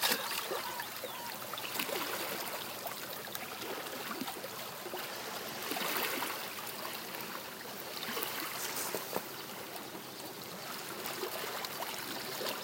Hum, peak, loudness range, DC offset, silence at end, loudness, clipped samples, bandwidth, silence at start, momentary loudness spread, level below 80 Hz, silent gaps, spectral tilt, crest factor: none; -14 dBFS; 3 LU; under 0.1%; 0 s; -38 LUFS; under 0.1%; 17 kHz; 0 s; 8 LU; -80 dBFS; none; -1.5 dB/octave; 26 dB